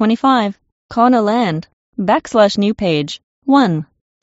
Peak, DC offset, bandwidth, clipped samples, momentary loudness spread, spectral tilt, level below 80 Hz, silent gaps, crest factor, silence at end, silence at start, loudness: 0 dBFS; under 0.1%; 8 kHz; under 0.1%; 13 LU; -4.5 dB/octave; -52 dBFS; 0.72-0.89 s, 1.73-1.93 s, 3.23-3.42 s; 16 dB; 0.4 s; 0 s; -15 LUFS